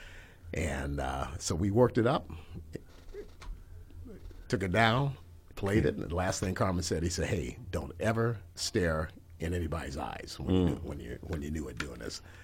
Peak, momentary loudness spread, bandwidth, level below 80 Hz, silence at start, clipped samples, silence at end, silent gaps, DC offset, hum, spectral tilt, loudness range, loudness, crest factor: -10 dBFS; 22 LU; 16.5 kHz; -48 dBFS; 0 s; under 0.1%; 0 s; none; under 0.1%; none; -5.5 dB/octave; 3 LU; -32 LUFS; 22 dB